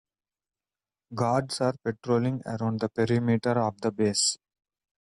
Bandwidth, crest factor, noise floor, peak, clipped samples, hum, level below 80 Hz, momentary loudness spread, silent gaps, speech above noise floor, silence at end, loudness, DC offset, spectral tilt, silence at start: 12 kHz; 16 dB; under -90 dBFS; -12 dBFS; under 0.1%; none; -64 dBFS; 6 LU; none; over 63 dB; 0.75 s; -27 LUFS; under 0.1%; -5 dB/octave; 1.1 s